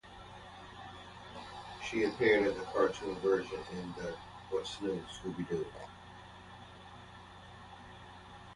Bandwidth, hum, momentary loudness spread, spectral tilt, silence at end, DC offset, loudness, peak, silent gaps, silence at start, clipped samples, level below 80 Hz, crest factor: 11.5 kHz; none; 21 LU; -5 dB/octave; 0 s; under 0.1%; -35 LUFS; -16 dBFS; none; 0.05 s; under 0.1%; -62 dBFS; 22 dB